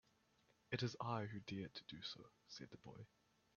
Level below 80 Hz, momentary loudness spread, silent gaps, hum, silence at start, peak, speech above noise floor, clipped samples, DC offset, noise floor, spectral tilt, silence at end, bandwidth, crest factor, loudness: -80 dBFS; 15 LU; none; none; 0.7 s; -28 dBFS; 29 dB; under 0.1%; under 0.1%; -78 dBFS; -4.5 dB/octave; 0.5 s; 7 kHz; 24 dB; -49 LUFS